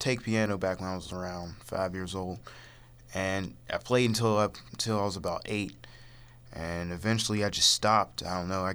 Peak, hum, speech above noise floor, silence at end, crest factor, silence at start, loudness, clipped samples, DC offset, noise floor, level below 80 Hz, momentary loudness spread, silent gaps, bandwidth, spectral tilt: -10 dBFS; none; 21 dB; 0 s; 20 dB; 0 s; -30 LUFS; under 0.1%; under 0.1%; -51 dBFS; -54 dBFS; 15 LU; none; over 20 kHz; -4 dB/octave